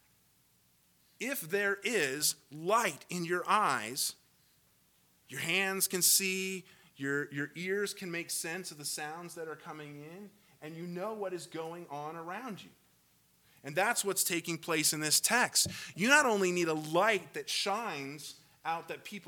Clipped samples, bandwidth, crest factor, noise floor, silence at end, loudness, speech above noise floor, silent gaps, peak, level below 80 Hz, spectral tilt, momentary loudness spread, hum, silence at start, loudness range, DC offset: under 0.1%; 19 kHz; 26 dB; -69 dBFS; 0 s; -32 LUFS; 36 dB; none; -10 dBFS; -78 dBFS; -2 dB/octave; 17 LU; none; 1.2 s; 14 LU; under 0.1%